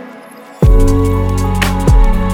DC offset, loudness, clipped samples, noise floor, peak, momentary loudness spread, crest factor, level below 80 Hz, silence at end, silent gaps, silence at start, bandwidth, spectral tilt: under 0.1%; -13 LUFS; under 0.1%; -34 dBFS; 0 dBFS; 4 LU; 10 dB; -12 dBFS; 0 s; none; 0 s; 16 kHz; -6.5 dB/octave